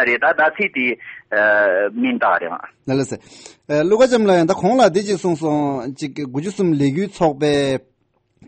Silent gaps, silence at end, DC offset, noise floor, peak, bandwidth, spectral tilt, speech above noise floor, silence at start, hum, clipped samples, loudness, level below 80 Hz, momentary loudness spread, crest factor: none; 0.7 s; under 0.1%; -64 dBFS; -2 dBFS; 8.8 kHz; -5.5 dB/octave; 47 dB; 0 s; none; under 0.1%; -17 LUFS; -56 dBFS; 12 LU; 14 dB